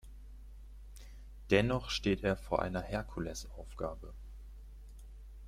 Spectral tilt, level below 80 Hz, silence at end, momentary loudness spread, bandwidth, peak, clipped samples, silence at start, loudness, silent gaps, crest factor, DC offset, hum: -5.5 dB/octave; -48 dBFS; 0 s; 23 LU; 16 kHz; -14 dBFS; under 0.1%; 0.05 s; -35 LUFS; none; 24 dB; under 0.1%; none